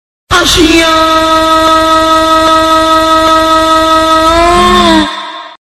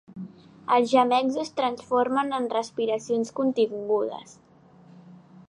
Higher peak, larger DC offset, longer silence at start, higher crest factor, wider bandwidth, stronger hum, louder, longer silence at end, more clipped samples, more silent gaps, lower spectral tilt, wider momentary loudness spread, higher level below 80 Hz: first, 0 dBFS vs -8 dBFS; first, 0.5% vs under 0.1%; first, 0.3 s vs 0.1 s; second, 6 dB vs 18 dB; first, 15 kHz vs 11 kHz; neither; first, -6 LUFS vs -25 LUFS; second, 0.1 s vs 0.35 s; first, 2% vs under 0.1%; neither; second, -3 dB/octave vs -4.5 dB/octave; second, 3 LU vs 19 LU; first, -26 dBFS vs -72 dBFS